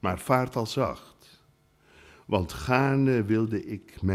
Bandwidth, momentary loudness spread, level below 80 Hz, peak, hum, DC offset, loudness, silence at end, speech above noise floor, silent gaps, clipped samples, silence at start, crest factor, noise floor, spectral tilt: 15.5 kHz; 9 LU; -50 dBFS; -8 dBFS; none; under 0.1%; -27 LUFS; 0 s; 37 dB; none; under 0.1%; 0.05 s; 20 dB; -63 dBFS; -7 dB/octave